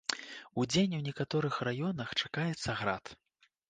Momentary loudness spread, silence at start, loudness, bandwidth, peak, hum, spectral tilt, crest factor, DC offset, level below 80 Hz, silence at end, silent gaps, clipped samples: 11 LU; 0.1 s; -34 LUFS; 9.6 kHz; -12 dBFS; none; -5 dB/octave; 22 dB; under 0.1%; -64 dBFS; 0.55 s; none; under 0.1%